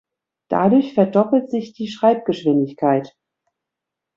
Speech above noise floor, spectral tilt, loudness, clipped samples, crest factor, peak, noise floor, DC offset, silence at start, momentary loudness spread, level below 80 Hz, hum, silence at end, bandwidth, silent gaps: 66 dB; -8 dB/octave; -18 LUFS; under 0.1%; 16 dB; -2 dBFS; -84 dBFS; under 0.1%; 0.5 s; 9 LU; -64 dBFS; none; 1.1 s; 7.2 kHz; none